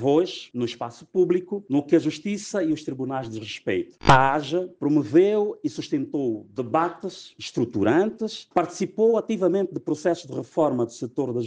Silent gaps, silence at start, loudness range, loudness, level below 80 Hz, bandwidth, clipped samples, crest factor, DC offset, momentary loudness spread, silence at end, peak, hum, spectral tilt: none; 0 s; 3 LU; -24 LUFS; -48 dBFS; 9.4 kHz; under 0.1%; 18 dB; under 0.1%; 11 LU; 0 s; -4 dBFS; none; -6 dB/octave